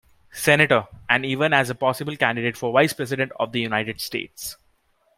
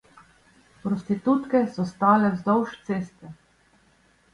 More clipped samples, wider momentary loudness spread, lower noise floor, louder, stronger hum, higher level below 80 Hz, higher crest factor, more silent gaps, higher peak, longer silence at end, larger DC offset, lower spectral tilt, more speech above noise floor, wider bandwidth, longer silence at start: neither; about the same, 12 LU vs 11 LU; about the same, -64 dBFS vs -61 dBFS; first, -21 LUFS vs -24 LUFS; neither; about the same, -60 dBFS vs -64 dBFS; about the same, 22 dB vs 20 dB; neither; first, -2 dBFS vs -6 dBFS; second, 0.65 s vs 1 s; neither; second, -4.5 dB/octave vs -8 dB/octave; first, 42 dB vs 38 dB; first, 16 kHz vs 10.5 kHz; second, 0.35 s vs 0.85 s